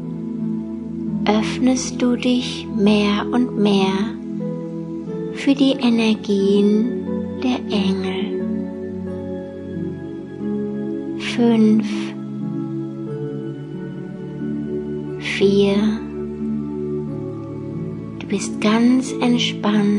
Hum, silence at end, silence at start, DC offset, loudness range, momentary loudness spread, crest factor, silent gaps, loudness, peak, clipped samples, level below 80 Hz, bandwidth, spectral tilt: none; 0 s; 0 s; under 0.1%; 6 LU; 12 LU; 18 dB; none; -21 LUFS; -2 dBFS; under 0.1%; -54 dBFS; 11 kHz; -6 dB/octave